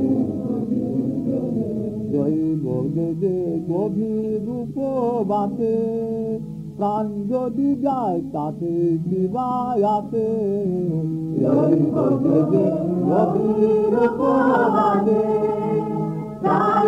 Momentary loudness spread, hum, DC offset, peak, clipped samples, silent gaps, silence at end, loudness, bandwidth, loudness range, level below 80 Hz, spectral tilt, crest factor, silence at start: 7 LU; none; under 0.1%; -6 dBFS; under 0.1%; none; 0 s; -21 LUFS; 9.8 kHz; 5 LU; -54 dBFS; -10 dB/octave; 14 dB; 0 s